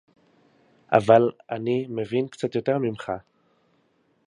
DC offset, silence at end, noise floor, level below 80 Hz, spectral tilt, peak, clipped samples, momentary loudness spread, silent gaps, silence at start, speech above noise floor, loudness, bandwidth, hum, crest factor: under 0.1%; 1.05 s; -66 dBFS; -64 dBFS; -7.5 dB/octave; -2 dBFS; under 0.1%; 14 LU; none; 0.9 s; 44 dB; -24 LUFS; 10.5 kHz; none; 24 dB